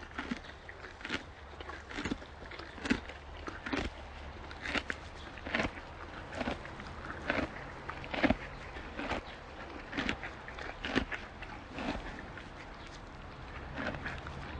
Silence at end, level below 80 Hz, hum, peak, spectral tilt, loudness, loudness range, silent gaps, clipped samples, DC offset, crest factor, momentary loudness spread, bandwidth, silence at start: 0 s; -50 dBFS; none; -10 dBFS; -5 dB/octave; -40 LUFS; 4 LU; none; under 0.1%; under 0.1%; 28 dB; 12 LU; 9.6 kHz; 0 s